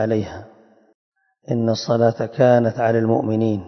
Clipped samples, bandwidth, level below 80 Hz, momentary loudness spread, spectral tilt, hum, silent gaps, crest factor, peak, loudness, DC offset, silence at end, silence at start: under 0.1%; 6.4 kHz; -58 dBFS; 10 LU; -7.5 dB/octave; none; 0.94-1.12 s; 18 dB; -2 dBFS; -19 LUFS; under 0.1%; 0 s; 0 s